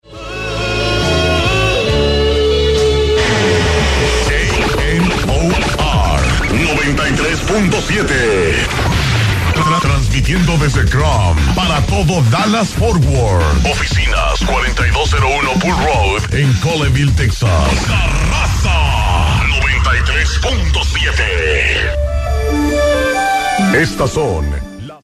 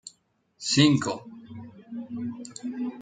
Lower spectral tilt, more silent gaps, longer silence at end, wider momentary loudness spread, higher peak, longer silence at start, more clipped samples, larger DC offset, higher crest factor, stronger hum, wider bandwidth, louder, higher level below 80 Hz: about the same, -5 dB/octave vs -4.5 dB/octave; neither; about the same, 0.05 s vs 0 s; second, 2 LU vs 24 LU; first, 0 dBFS vs -4 dBFS; about the same, 0.1 s vs 0.05 s; neither; neither; second, 12 dB vs 24 dB; neither; first, 14.5 kHz vs 9.4 kHz; first, -13 LUFS vs -26 LUFS; first, -18 dBFS vs -66 dBFS